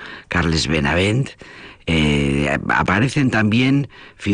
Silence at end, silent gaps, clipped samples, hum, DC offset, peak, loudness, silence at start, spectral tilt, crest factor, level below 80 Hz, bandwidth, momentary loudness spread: 0 s; none; under 0.1%; none; under 0.1%; -6 dBFS; -18 LUFS; 0 s; -5.5 dB/octave; 12 dB; -36 dBFS; 10 kHz; 12 LU